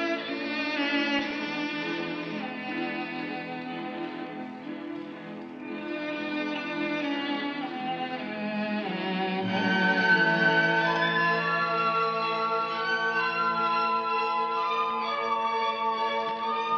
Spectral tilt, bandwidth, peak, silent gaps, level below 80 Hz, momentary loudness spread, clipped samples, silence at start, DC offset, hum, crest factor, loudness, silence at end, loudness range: -5.5 dB/octave; 7.2 kHz; -12 dBFS; none; -76 dBFS; 12 LU; under 0.1%; 0 s; under 0.1%; none; 18 dB; -28 LUFS; 0 s; 11 LU